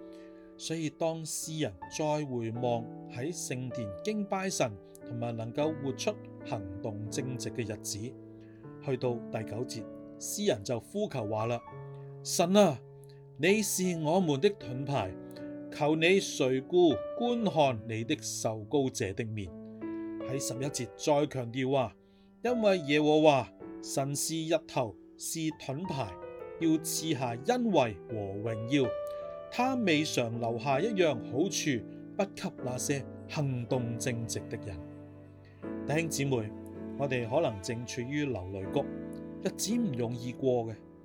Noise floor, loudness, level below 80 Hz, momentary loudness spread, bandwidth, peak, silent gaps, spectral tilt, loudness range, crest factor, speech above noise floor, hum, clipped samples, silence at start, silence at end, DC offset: -52 dBFS; -32 LUFS; -68 dBFS; 15 LU; 19 kHz; -10 dBFS; none; -5 dB/octave; 7 LU; 22 dB; 21 dB; none; under 0.1%; 0 s; 0 s; under 0.1%